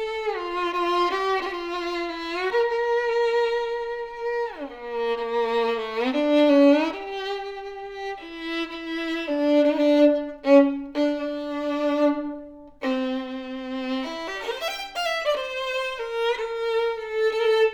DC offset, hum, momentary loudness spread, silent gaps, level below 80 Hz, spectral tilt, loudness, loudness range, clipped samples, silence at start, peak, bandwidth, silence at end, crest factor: under 0.1%; none; 13 LU; none; -56 dBFS; -3.5 dB/octave; -24 LUFS; 6 LU; under 0.1%; 0 s; -6 dBFS; 17.5 kHz; 0 s; 18 dB